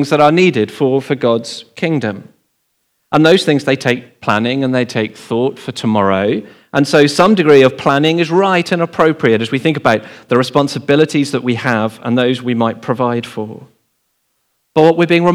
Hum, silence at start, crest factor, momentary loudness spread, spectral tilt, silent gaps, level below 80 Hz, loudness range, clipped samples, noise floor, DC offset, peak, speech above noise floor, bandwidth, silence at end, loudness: none; 0 s; 14 dB; 9 LU; -6 dB/octave; none; -58 dBFS; 5 LU; 0.2%; -65 dBFS; under 0.1%; 0 dBFS; 52 dB; 15 kHz; 0 s; -13 LUFS